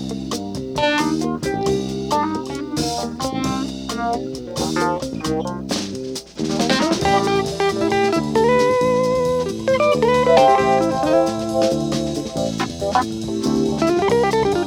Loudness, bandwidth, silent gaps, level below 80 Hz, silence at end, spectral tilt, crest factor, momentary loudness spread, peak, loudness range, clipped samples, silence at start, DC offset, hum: -19 LUFS; 17.5 kHz; none; -42 dBFS; 0 s; -5 dB/octave; 18 dB; 9 LU; -2 dBFS; 7 LU; under 0.1%; 0 s; under 0.1%; none